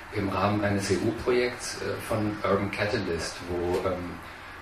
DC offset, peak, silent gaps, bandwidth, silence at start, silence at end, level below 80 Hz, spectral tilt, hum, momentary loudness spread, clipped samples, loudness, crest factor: under 0.1%; -12 dBFS; none; 14 kHz; 0 s; 0 s; -48 dBFS; -5.5 dB/octave; none; 7 LU; under 0.1%; -28 LUFS; 18 dB